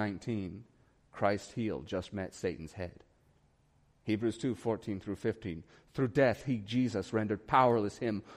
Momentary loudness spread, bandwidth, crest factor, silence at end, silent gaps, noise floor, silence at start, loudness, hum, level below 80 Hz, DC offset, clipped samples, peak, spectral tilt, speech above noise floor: 16 LU; 13 kHz; 22 dB; 0 s; none; -69 dBFS; 0 s; -34 LUFS; none; -62 dBFS; under 0.1%; under 0.1%; -12 dBFS; -6.5 dB/octave; 35 dB